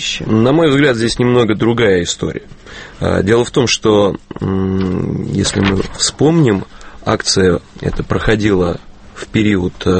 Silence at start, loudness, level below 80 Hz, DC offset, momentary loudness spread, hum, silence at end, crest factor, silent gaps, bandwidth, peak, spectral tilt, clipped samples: 0 s; -14 LUFS; -32 dBFS; under 0.1%; 11 LU; none; 0 s; 14 dB; none; 8.8 kHz; 0 dBFS; -5 dB/octave; under 0.1%